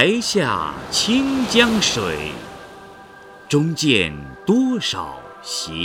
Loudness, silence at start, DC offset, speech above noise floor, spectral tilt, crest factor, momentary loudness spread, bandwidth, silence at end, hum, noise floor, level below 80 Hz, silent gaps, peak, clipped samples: -19 LUFS; 0 s; under 0.1%; 23 dB; -3.5 dB/octave; 20 dB; 17 LU; 17 kHz; 0 s; none; -42 dBFS; -48 dBFS; none; 0 dBFS; under 0.1%